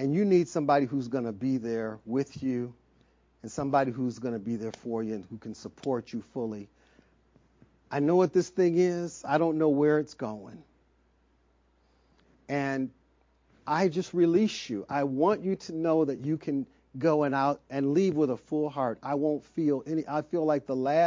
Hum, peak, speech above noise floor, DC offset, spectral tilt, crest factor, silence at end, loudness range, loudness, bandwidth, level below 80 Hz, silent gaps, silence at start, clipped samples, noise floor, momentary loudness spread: none; -12 dBFS; 39 dB; under 0.1%; -7 dB/octave; 18 dB; 0 s; 9 LU; -29 LUFS; 7.6 kHz; -68 dBFS; none; 0 s; under 0.1%; -67 dBFS; 12 LU